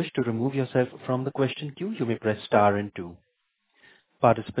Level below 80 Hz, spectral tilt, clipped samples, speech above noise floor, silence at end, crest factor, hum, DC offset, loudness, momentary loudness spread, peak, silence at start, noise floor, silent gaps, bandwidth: -60 dBFS; -11 dB/octave; under 0.1%; 50 dB; 0 s; 22 dB; none; under 0.1%; -26 LUFS; 11 LU; -6 dBFS; 0 s; -75 dBFS; none; 4 kHz